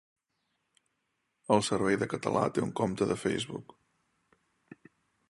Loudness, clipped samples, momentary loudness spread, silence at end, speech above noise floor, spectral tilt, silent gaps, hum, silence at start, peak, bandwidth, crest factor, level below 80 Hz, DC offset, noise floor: -30 LUFS; under 0.1%; 10 LU; 1.65 s; 50 dB; -5 dB/octave; none; none; 1.5 s; -10 dBFS; 11.5 kHz; 24 dB; -64 dBFS; under 0.1%; -80 dBFS